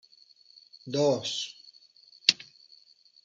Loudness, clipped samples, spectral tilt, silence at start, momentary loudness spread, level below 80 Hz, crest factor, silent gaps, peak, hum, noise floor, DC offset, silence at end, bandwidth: -28 LUFS; under 0.1%; -3 dB/octave; 0.85 s; 24 LU; -78 dBFS; 30 dB; none; -2 dBFS; none; -60 dBFS; under 0.1%; 0.8 s; 9.4 kHz